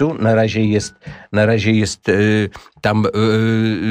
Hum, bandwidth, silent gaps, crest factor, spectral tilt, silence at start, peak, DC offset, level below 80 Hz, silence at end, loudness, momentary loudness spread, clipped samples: none; 10 kHz; none; 14 dB; -6 dB/octave; 0 s; -2 dBFS; under 0.1%; -48 dBFS; 0 s; -16 LUFS; 7 LU; under 0.1%